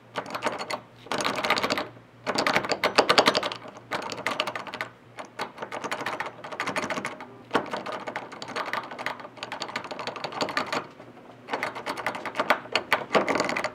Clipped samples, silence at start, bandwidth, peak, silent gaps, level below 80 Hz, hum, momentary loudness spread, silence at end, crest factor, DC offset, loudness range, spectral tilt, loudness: under 0.1%; 0 s; 17.5 kHz; 0 dBFS; none; -70 dBFS; none; 13 LU; 0 s; 30 dB; under 0.1%; 8 LU; -2.5 dB/octave; -28 LUFS